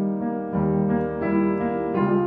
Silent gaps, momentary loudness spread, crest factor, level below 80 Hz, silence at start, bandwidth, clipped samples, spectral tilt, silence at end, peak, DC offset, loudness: none; 4 LU; 14 dB; -48 dBFS; 0 s; 4.2 kHz; under 0.1%; -12 dB/octave; 0 s; -8 dBFS; under 0.1%; -24 LUFS